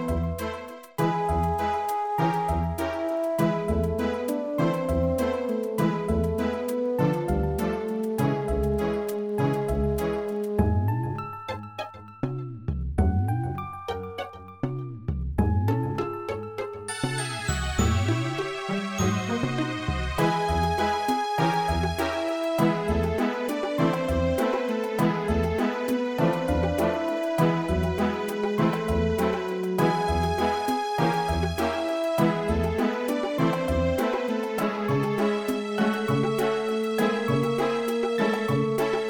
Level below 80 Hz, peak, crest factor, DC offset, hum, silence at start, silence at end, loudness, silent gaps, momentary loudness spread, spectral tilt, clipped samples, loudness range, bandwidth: -38 dBFS; -10 dBFS; 16 dB; under 0.1%; none; 0 s; 0 s; -26 LUFS; none; 8 LU; -6.5 dB/octave; under 0.1%; 4 LU; 17.5 kHz